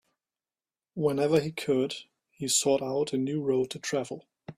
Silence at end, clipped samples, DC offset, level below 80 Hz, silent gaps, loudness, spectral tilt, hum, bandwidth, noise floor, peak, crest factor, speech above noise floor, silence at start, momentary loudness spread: 0.05 s; under 0.1%; under 0.1%; -70 dBFS; none; -28 LUFS; -4 dB/octave; none; 15 kHz; under -90 dBFS; -10 dBFS; 20 dB; over 62 dB; 0.95 s; 14 LU